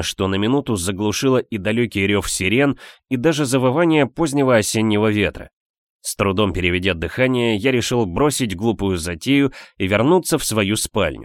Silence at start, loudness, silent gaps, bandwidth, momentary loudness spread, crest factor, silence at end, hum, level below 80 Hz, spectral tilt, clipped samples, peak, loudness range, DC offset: 0 s; -18 LUFS; 5.53-5.99 s; 17.5 kHz; 6 LU; 16 dB; 0 s; none; -42 dBFS; -4.5 dB/octave; under 0.1%; -2 dBFS; 2 LU; under 0.1%